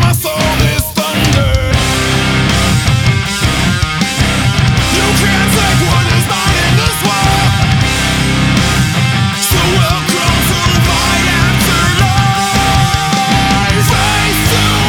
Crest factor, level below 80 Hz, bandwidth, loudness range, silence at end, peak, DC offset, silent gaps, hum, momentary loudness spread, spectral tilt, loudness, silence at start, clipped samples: 10 dB; -22 dBFS; over 20 kHz; 1 LU; 0 s; 0 dBFS; under 0.1%; none; none; 2 LU; -4 dB/octave; -11 LUFS; 0 s; under 0.1%